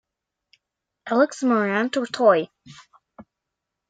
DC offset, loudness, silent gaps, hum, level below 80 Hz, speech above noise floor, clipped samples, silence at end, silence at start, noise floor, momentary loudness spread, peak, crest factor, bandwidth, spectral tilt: under 0.1%; -21 LUFS; none; none; -74 dBFS; 62 dB; under 0.1%; 0.65 s; 1.05 s; -83 dBFS; 10 LU; -4 dBFS; 20 dB; 9.2 kHz; -5 dB/octave